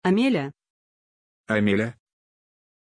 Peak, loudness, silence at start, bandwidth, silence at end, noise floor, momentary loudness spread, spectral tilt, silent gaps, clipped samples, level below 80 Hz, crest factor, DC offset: -8 dBFS; -24 LUFS; 0.05 s; 10.5 kHz; 0.9 s; under -90 dBFS; 10 LU; -7 dB/octave; 0.70-1.44 s; under 0.1%; -64 dBFS; 20 dB; under 0.1%